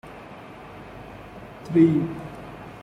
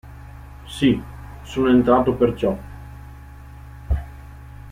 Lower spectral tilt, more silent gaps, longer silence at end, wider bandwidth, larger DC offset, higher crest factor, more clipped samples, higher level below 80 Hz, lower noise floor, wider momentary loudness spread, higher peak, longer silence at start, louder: first, -9 dB/octave vs -7.5 dB/octave; neither; about the same, 0 s vs 0 s; second, 6.4 kHz vs 15 kHz; neither; about the same, 20 dB vs 18 dB; neither; second, -54 dBFS vs -34 dBFS; about the same, -42 dBFS vs -40 dBFS; about the same, 23 LU vs 24 LU; about the same, -6 dBFS vs -4 dBFS; about the same, 0.05 s vs 0.05 s; about the same, -21 LUFS vs -20 LUFS